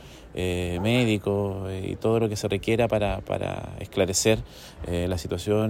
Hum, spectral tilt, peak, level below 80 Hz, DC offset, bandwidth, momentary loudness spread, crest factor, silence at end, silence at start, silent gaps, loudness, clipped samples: none; -5 dB/octave; -8 dBFS; -44 dBFS; under 0.1%; 16 kHz; 10 LU; 18 dB; 0 s; 0 s; none; -26 LUFS; under 0.1%